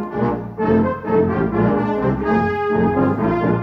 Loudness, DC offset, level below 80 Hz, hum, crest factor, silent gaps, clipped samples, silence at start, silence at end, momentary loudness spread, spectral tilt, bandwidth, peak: -18 LUFS; under 0.1%; -40 dBFS; none; 14 dB; none; under 0.1%; 0 s; 0 s; 4 LU; -10 dB/octave; 6 kHz; -4 dBFS